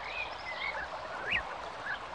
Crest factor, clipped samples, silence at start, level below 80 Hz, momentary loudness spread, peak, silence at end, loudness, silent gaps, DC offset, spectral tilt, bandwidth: 18 dB; under 0.1%; 0 s; -58 dBFS; 7 LU; -20 dBFS; 0 s; -36 LUFS; none; under 0.1%; -3 dB/octave; 10.5 kHz